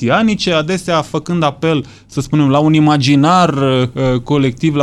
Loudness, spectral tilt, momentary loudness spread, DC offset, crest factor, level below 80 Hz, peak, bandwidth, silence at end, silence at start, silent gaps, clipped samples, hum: -13 LUFS; -6.5 dB/octave; 6 LU; under 0.1%; 12 dB; -42 dBFS; 0 dBFS; 12 kHz; 0 s; 0 s; none; under 0.1%; none